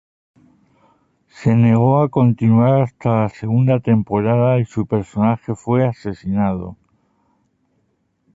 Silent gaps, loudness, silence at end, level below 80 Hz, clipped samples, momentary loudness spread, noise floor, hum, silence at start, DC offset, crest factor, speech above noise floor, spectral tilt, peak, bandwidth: none; -17 LUFS; 1.6 s; -48 dBFS; under 0.1%; 8 LU; -65 dBFS; none; 1.4 s; under 0.1%; 16 dB; 50 dB; -10 dB/octave; -2 dBFS; 7.8 kHz